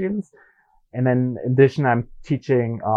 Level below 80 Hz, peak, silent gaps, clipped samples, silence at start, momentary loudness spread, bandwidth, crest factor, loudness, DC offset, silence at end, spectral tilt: -54 dBFS; -2 dBFS; none; under 0.1%; 0 s; 13 LU; 7.2 kHz; 18 dB; -21 LUFS; under 0.1%; 0 s; -9 dB/octave